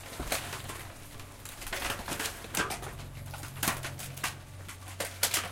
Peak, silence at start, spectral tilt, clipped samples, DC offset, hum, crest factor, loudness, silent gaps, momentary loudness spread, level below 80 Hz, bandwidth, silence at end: -10 dBFS; 0 s; -2 dB/octave; under 0.1%; under 0.1%; none; 26 dB; -35 LUFS; none; 14 LU; -50 dBFS; 17 kHz; 0 s